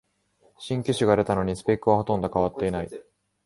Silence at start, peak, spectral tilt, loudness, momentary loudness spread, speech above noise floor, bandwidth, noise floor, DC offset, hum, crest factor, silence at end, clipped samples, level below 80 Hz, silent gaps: 0.6 s; -6 dBFS; -6.5 dB/octave; -25 LUFS; 13 LU; 40 dB; 11.5 kHz; -64 dBFS; under 0.1%; none; 20 dB; 0.45 s; under 0.1%; -48 dBFS; none